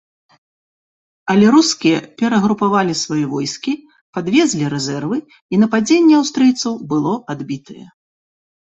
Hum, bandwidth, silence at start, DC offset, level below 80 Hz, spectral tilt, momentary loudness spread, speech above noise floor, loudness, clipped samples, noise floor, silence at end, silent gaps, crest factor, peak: none; 8.2 kHz; 1.25 s; under 0.1%; -58 dBFS; -5 dB/octave; 14 LU; over 75 dB; -16 LUFS; under 0.1%; under -90 dBFS; 0.85 s; 4.01-4.13 s, 5.42-5.49 s; 16 dB; -2 dBFS